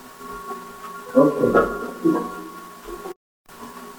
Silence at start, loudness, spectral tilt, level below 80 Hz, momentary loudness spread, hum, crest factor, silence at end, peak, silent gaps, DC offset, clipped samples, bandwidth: 0 s; -21 LUFS; -6.5 dB/octave; -50 dBFS; 21 LU; none; 22 dB; 0 s; -2 dBFS; 3.16-3.45 s; under 0.1%; under 0.1%; over 20 kHz